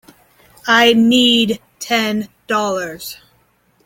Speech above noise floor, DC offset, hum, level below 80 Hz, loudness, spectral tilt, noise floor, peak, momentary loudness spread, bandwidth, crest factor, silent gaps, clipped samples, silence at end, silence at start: 43 dB; under 0.1%; none; -56 dBFS; -14 LUFS; -3 dB/octave; -58 dBFS; 0 dBFS; 16 LU; 17 kHz; 16 dB; none; under 0.1%; 0.7 s; 0.65 s